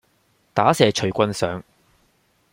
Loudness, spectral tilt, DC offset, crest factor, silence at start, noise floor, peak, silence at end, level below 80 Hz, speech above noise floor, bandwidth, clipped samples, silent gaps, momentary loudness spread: -20 LUFS; -5 dB/octave; under 0.1%; 22 dB; 0.55 s; -63 dBFS; -2 dBFS; 0.9 s; -58 dBFS; 44 dB; 16.5 kHz; under 0.1%; none; 10 LU